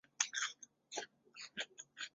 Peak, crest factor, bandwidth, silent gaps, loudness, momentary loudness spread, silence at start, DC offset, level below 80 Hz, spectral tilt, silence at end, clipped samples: -14 dBFS; 32 dB; 8 kHz; none; -43 LUFS; 16 LU; 0.2 s; under 0.1%; under -90 dBFS; 2.5 dB/octave; 0.05 s; under 0.1%